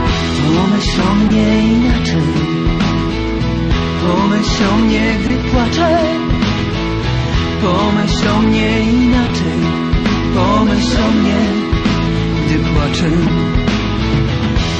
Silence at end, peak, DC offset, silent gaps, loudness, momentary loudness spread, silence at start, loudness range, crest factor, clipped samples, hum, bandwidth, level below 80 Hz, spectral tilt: 0 s; -2 dBFS; under 0.1%; none; -14 LUFS; 4 LU; 0 s; 1 LU; 12 dB; under 0.1%; none; 9 kHz; -22 dBFS; -6 dB/octave